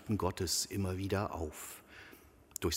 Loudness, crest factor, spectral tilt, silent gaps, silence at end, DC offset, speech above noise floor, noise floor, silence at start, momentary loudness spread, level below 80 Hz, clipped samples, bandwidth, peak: -37 LUFS; 22 dB; -4 dB/octave; none; 0 s; under 0.1%; 22 dB; -59 dBFS; 0 s; 20 LU; -54 dBFS; under 0.1%; 16 kHz; -14 dBFS